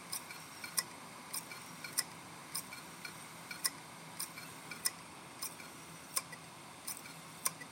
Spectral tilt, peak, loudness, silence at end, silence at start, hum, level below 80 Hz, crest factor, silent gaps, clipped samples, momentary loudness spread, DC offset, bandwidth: -0.5 dB/octave; -16 dBFS; -42 LUFS; 0 s; 0 s; none; -82 dBFS; 30 dB; none; under 0.1%; 12 LU; under 0.1%; 17 kHz